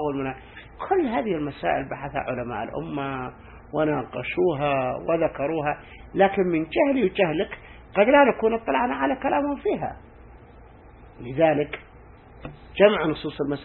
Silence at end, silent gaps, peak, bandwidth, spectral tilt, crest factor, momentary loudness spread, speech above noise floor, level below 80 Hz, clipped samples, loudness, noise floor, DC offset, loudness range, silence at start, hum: 0 s; none; -4 dBFS; 4.3 kHz; -10.5 dB/octave; 22 dB; 16 LU; 24 dB; -50 dBFS; under 0.1%; -24 LUFS; -48 dBFS; under 0.1%; 6 LU; 0 s; none